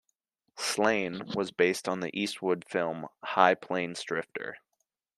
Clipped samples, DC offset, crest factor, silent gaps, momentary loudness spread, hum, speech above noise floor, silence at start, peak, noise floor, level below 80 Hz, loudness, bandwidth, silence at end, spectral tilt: under 0.1%; under 0.1%; 26 dB; none; 10 LU; none; 51 dB; 0.55 s; -4 dBFS; -81 dBFS; -74 dBFS; -30 LUFS; 14 kHz; 0.6 s; -4 dB/octave